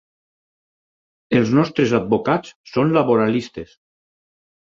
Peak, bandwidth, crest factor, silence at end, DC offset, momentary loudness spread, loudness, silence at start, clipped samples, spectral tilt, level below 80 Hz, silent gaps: -2 dBFS; 7.6 kHz; 18 dB; 1.05 s; under 0.1%; 9 LU; -18 LUFS; 1.3 s; under 0.1%; -7 dB/octave; -56 dBFS; 2.55-2.64 s